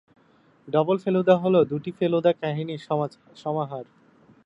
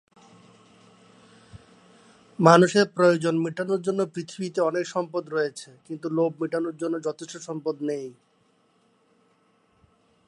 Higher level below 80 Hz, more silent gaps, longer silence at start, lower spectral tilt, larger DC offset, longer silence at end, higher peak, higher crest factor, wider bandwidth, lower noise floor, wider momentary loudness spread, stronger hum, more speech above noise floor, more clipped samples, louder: about the same, -70 dBFS vs -72 dBFS; neither; second, 0.65 s vs 1.55 s; first, -8.5 dB/octave vs -6 dB/octave; neither; second, 0.6 s vs 2.15 s; second, -4 dBFS vs 0 dBFS; second, 20 dB vs 26 dB; second, 8 kHz vs 11.5 kHz; second, -59 dBFS vs -65 dBFS; second, 13 LU vs 18 LU; neither; second, 36 dB vs 41 dB; neither; about the same, -24 LUFS vs -24 LUFS